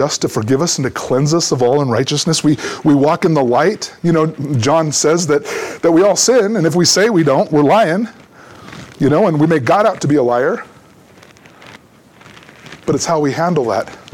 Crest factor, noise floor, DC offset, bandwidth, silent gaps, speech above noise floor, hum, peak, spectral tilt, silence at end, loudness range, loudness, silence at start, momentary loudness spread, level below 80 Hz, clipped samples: 12 dB; -45 dBFS; under 0.1%; 18.5 kHz; none; 31 dB; none; -2 dBFS; -4.5 dB/octave; 0.15 s; 8 LU; -14 LUFS; 0 s; 8 LU; -52 dBFS; under 0.1%